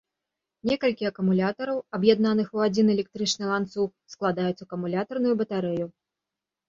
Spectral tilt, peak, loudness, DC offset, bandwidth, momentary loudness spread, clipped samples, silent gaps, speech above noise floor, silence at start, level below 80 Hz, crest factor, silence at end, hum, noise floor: -5.5 dB/octave; -6 dBFS; -26 LUFS; under 0.1%; 7.6 kHz; 8 LU; under 0.1%; none; 63 dB; 0.65 s; -66 dBFS; 20 dB; 0.8 s; none; -88 dBFS